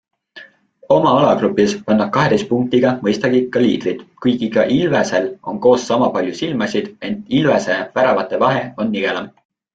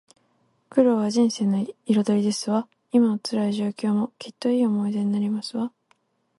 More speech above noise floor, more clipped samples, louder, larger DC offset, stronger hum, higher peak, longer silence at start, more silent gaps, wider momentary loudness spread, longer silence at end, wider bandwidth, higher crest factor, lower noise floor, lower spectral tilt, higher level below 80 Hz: second, 28 dB vs 44 dB; neither; first, -16 LUFS vs -24 LUFS; neither; neither; first, -2 dBFS vs -6 dBFS; second, 0.35 s vs 0.7 s; neither; about the same, 7 LU vs 7 LU; second, 0.45 s vs 0.7 s; second, 8.8 kHz vs 11.5 kHz; about the same, 14 dB vs 18 dB; second, -44 dBFS vs -67 dBFS; about the same, -6 dB/octave vs -6 dB/octave; first, -54 dBFS vs -72 dBFS